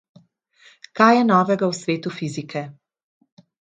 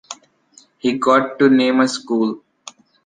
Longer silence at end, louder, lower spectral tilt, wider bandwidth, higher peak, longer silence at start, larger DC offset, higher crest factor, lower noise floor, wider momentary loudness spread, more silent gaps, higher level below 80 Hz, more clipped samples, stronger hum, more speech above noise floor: first, 1.05 s vs 0.65 s; about the same, -19 LUFS vs -17 LUFS; first, -6 dB/octave vs -4.5 dB/octave; about the same, 9.2 kHz vs 9.6 kHz; about the same, 0 dBFS vs -2 dBFS; first, 0.95 s vs 0.1 s; neither; first, 22 dB vs 16 dB; about the same, -55 dBFS vs -52 dBFS; second, 16 LU vs 19 LU; neither; about the same, -70 dBFS vs -66 dBFS; neither; neither; about the same, 36 dB vs 36 dB